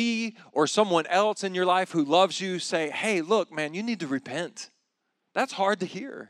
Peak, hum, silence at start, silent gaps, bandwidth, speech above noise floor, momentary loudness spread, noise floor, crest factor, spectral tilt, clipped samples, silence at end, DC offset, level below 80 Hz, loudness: -8 dBFS; none; 0 s; none; 12.5 kHz; 52 dB; 11 LU; -78 dBFS; 18 dB; -4 dB/octave; under 0.1%; 0.05 s; under 0.1%; -90 dBFS; -26 LUFS